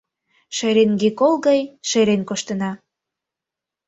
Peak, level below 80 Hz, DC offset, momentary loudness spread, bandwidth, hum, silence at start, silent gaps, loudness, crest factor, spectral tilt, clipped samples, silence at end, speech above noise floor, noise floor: -4 dBFS; -62 dBFS; under 0.1%; 11 LU; 8 kHz; none; 0.5 s; none; -19 LUFS; 16 dB; -4.5 dB/octave; under 0.1%; 1.1 s; 68 dB; -86 dBFS